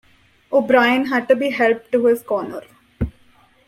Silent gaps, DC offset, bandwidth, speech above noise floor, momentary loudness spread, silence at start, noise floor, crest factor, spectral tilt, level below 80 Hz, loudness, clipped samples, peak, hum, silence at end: none; under 0.1%; 16 kHz; 36 dB; 14 LU; 0.5 s; -53 dBFS; 18 dB; -6 dB/octave; -42 dBFS; -18 LUFS; under 0.1%; -2 dBFS; none; 0.55 s